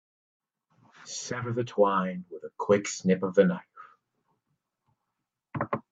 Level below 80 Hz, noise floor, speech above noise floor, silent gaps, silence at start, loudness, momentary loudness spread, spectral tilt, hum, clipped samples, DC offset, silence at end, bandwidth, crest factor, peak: -72 dBFS; -85 dBFS; 58 dB; none; 1.05 s; -28 LUFS; 15 LU; -5.5 dB/octave; none; under 0.1%; under 0.1%; 0.1 s; 8 kHz; 22 dB; -8 dBFS